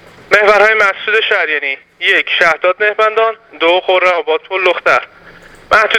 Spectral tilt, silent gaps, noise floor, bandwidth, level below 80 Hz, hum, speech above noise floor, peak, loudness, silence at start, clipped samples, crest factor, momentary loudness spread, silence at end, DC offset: -2.5 dB/octave; none; -38 dBFS; 14.5 kHz; -52 dBFS; none; 26 dB; 0 dBFS; -11 LUFS; 0.3 s; 0.2%; 12 dB; 7 LU; 0 s; under 0.1%